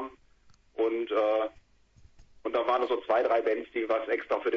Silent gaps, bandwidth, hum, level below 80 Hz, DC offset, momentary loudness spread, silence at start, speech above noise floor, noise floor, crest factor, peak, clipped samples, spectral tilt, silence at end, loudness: none; 7 kHz; none; -64 dBFS; under 0.1%; 9 LU; 0 s; 33 dB; -60 dBFS; 16 dB; -14 dBFS; under 0.1%; -5 dB/octave; 0 s; -29 LUFS